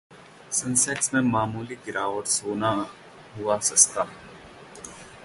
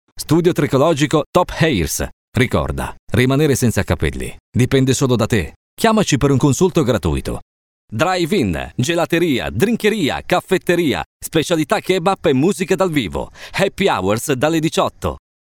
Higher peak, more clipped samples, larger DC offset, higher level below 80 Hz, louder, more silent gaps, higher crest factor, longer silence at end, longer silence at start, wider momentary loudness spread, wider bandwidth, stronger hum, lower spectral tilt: about the same, -2 dBFS vs 0 dBFS; neither; neither; second, -60 dBFS vs -36 dBFS; second, -24 LUFS vs -17 LUFS; second, none vs 1.26-1.33 s, 2.13-2.32 s, 2.99-3.07 s, 4.40-4.52 s, 5.56-5.77 s, 7.42-7.88 s, 11.06-11.20 s; first, 24 dB vs 16 dB; second, 0 s vs 0.25 s; about the same, 0.1 s vs 0.15 s; first, 23 LU vs 8 LU; second, 12 kHz vs 19 kHz; neither; second, -2.5 dB/octave vs -5.5 dB/octave